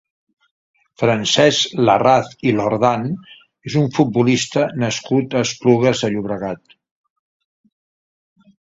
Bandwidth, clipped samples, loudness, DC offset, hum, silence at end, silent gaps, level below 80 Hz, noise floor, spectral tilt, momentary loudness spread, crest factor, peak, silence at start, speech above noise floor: 7.8 kHz; under 0.1%; -17 LUFS; under 0.1%; none; 2.15 s; none; -56 dBFS; under -90 dBFS; -5 dB/octave; 11 LU; 18 dB; 0 dBFS; 1 s; over 73 dB